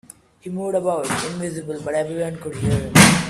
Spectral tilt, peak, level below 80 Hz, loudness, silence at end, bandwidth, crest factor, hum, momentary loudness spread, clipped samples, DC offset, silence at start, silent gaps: -4 dB/octave; 0 dBFS; -44 dBFS; -21 LUFS; 0 s; 15.5 kHz; 20 dB; none; 15 LU; under 0.1%; under 0.1%; 0.45 s; none